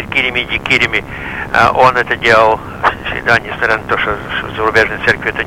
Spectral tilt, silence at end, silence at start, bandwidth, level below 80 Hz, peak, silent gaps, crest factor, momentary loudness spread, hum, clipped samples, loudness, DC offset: -4.5 dB/octave; 0 s; 0 s; 16.5 kHz; -36 dBFS; 0 dBFS; none; 14 dB; 9 LU; none; under 0.1%; -12 LUFS; under 0.1%